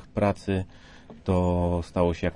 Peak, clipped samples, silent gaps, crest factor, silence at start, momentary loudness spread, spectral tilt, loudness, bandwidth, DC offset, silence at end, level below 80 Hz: -10 dBFS; under 0.1%; none; 16 dB; 0 s; 8 LU; -8 dB/octave; -27 LUFS; 11 kHz; under 0.1%; 0 s; -46 dBFS